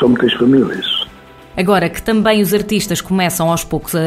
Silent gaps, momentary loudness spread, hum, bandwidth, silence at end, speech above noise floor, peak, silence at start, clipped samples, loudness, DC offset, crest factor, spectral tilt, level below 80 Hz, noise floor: none; 7 LU; none; 16 kHz; 0 s; 25 dB; -2 dBFS; 0 s; under 0.1%; -14 LUFS; under 0.1%; 14 dB; -4.5 dB/octave; -40 dBFS; -38 dBFS